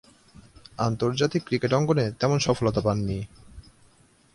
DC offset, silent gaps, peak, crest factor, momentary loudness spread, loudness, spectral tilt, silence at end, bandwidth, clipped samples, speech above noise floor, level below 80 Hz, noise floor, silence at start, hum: under 0.1%; none; -8 dBFS; 18 dB; 9 LU; -25 LUFS; -6 dB/octave; 0.75 s; 11.5 kHz; under 0.1%; 35 dB; -50 dBFS; -59 dBFS; 0.8 s; none